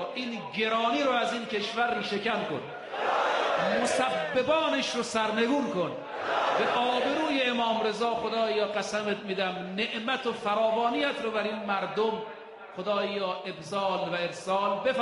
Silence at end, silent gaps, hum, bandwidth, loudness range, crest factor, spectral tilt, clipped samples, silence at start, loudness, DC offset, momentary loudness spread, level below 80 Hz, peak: 0 s; none; none; 11.5 kHz; 3 LU; 14 dB; -4 dB/octave; under 0.1%; 0 s; -28 LUFS; under 0.1%; 7 LU; -70 dBFS; -14 dBFS